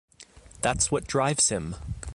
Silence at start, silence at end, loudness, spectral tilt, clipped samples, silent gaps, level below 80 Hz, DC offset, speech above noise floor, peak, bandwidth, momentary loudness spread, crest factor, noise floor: 0.2 s; 0 s; -25 LUFS; -3 dB/octave; under 0.1%; none; -44 dBFS; under 0.1%; 25 dB; -10 dBFS; 11.5 kHz; 12 LU; 18 dB; -51 dBFS